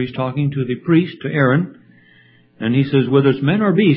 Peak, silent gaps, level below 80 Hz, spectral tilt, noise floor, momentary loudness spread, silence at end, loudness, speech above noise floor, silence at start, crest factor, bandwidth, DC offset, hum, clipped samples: 0 dBFS; none; -56 dBFS; -12.5 dB/octave; -50 dBFS; 7 LU; 0 s; -17 LUFS; 35 dB; 0 s; 16 dB; 5.2 kHz; under 0.1%; none; under 0.1%